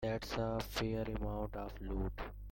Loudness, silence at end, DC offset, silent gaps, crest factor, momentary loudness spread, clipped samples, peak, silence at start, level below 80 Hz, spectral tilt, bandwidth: -41 LUFS; 0 s; under 0.1%; none; 16 dB; 6 LU; under 0.1%; -24 dBFS; 0 s; -46 dBFS; -6 dB/octave; 17 kHz